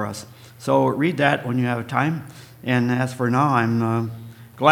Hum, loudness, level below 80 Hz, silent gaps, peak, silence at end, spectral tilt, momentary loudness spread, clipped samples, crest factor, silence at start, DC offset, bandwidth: none; -21 LUFS; -62 dBFS; none; 0 dBFS; 0 s; -6.5 dB/octave; 14 LU; under 0.1%; 22 dB; 0 s; under 0.1%; 18 kHz